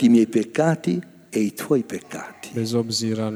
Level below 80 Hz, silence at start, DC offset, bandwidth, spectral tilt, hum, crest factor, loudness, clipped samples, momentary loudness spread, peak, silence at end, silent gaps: -70 dBFS; 0 s; under 0.1%; over 20 kHz; -5.5 dB/octave; none; 16 dB; -23 LUFS; under 0.1%; 13 LU; -4 dBFS; 0 s; none